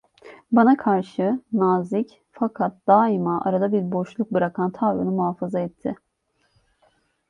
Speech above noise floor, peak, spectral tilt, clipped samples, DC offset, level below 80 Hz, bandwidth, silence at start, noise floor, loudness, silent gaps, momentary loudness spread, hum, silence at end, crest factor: 48 dB; -4 dBFS; -9.5 dB/octave; under 0.1%; under 0.1%; -66 dBFS; 7.2 kHz; 0.25 s; -69 dBFS; -22 LUFS; none; 10 LU; none; 1.35 s; 20 dB